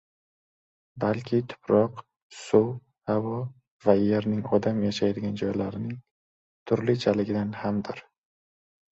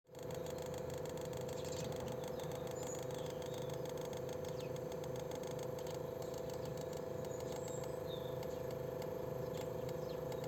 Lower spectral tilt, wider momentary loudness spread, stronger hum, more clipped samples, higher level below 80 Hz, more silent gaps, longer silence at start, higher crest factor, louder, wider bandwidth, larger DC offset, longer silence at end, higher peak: first, -7.5 dB/octave vs -5.5 dB/octave; first, 13 LU vs 1 LU; neither; neither; first, -60 dBFS vs -66 dBFS; first, 2.22-2.30 s, 3.71-3.79 s, 6.11-6.66 s vs none; first, 0.95 s vs 0.1 s; first, 22 dB vs 14 dB; first, -27 LUFS vs -44 LUFS; second, 8 kHz vs 17 kHz; neither; first, 0.9 s vs 0 s; first, -6 dBFS vs -30 dBFS